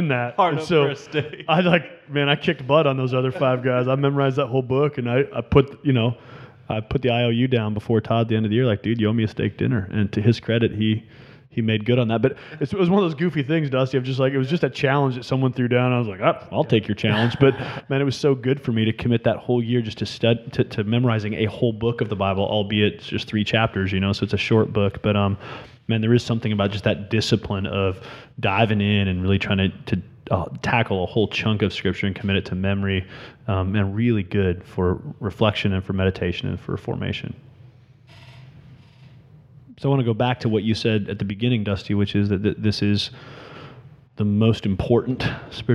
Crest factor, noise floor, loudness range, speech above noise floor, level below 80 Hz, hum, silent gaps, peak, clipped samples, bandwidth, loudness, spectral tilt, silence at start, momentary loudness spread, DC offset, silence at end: 22 dB; -49 dBFS; 3 LU; 28 dB; -48 dBFS; none; none; 0 dBFS; under 0.1%; 10.5 kHz; -22 LUFS; -7.5 dB/octave; 0 s; 8 LU; under 0.1%; 0 s